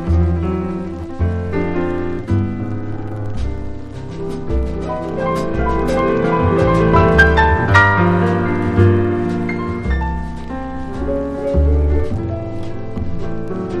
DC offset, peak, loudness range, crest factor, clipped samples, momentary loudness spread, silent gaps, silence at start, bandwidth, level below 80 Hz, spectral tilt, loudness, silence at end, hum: under 0.1%; 0 dBFS; 9 LU; 16 dB; under 0.1%; 14 LU; none; 0 s; 10 kHz; -24 dBFS; -8 dB/octave; -17 LUFS; 0 s; none